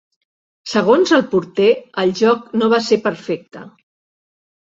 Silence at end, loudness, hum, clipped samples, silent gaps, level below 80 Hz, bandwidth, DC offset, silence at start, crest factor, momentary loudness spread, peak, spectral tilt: 1 s; -16 LUFS; none; under 0.1%; none; -62 dBFS; 7.8 kHz; under 0.1%; 0.65 s; 16 dB; 12 LU; -2 dBFS; -5 dB/octave